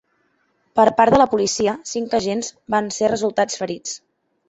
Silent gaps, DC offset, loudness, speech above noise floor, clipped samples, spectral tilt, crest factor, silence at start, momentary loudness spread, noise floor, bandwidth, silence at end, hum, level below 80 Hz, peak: none; under 0.1%; -19 LUFS; 47 dB; under 0.1%; -4 dB/octave; 20 dB; 0.75 s; 12 LU; -65 dBFS; 8.2 kHz; 0.5 s; none; -52 dBFS; 0 dBFS